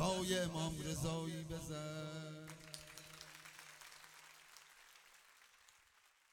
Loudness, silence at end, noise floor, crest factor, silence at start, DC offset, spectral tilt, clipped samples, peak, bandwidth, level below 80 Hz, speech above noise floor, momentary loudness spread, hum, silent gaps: -44 LUFS; 0.6 s; -72 dBFS; 22 dB; 0 s; under 0.1%; -4.5 dB/octave; under 0.1%; -24 dBFS; 18 kHz; -64 dBFS; 29 dB; 25 LU; none; none